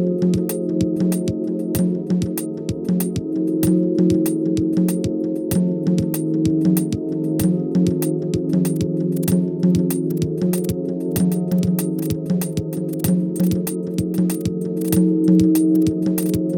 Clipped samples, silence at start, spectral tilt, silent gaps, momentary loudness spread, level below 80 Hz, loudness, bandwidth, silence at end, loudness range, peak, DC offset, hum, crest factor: under 0.1%; 0 s; -7.5 dB/octave; none; 6 LU; -48 dBFS; -20 LUFS; over 20 kHz; 0 s; 3 LU; -4 dBFS; under 0.1%; none; 14 dB